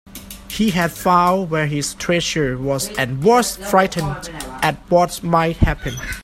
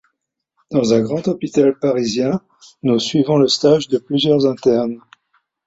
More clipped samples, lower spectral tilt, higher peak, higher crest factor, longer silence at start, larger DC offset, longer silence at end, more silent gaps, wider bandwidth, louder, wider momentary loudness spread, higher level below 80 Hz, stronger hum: neither; about the same, -4.5 dB/octave vs -5.5 dB/octave; about the same, 0 dBFS vs -2 dBFS; about the same, 18 dB vs 16 dB; second, 0.05 s vs 0.7 s; neither; second, 0 s vs 0.7 s; neither; first, 16.5 kHz vs 8 kHz; about the same, -18 LUFS vs -17 LUFS; first, 11 LU vs 7 LU; first, -34 dBFS vs -58 dBFS; neither